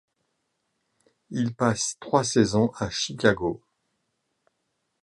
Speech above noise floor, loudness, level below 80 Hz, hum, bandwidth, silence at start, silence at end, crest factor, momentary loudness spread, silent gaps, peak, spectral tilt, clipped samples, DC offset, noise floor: 53 dB; -25 LUFS; -56 dBFS; none; 11.5 kHz; 1.3 s; 1.45 s; 24 dB; 9 LU; none; -4 dBFS; -4.5 dB/octave; under 0.1%; under 0.1%; -77 dBFS